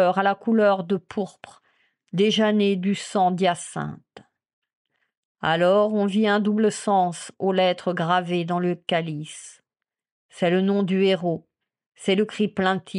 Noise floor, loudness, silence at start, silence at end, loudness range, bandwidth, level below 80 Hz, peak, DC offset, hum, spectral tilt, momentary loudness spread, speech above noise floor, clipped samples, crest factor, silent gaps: -88 dBFS; -22 LUFS; 0 s; 0 s; 4 LU; 11 kHz; -70 dBFS; -6 dBFS; under 0.1%; none; -5.5 dB/octave; 11 LU; 66 dB; under 0.1%; 16 dB; 4.53-4.62 s, 4.75-4.85 s, 5.17-5.35 s, 10.12-10.29 s, 11.86-11.90 s